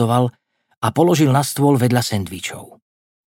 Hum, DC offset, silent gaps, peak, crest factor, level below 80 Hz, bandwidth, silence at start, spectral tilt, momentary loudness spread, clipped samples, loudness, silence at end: none; under 0.1%; 0.77-0.81 s; -2 dBFS; 16 dB; -56 dBFS; 17 kHz; 0 s; -6 dB/octave; 13 LU; under 0.1%; -17 LUFS; 0.6 s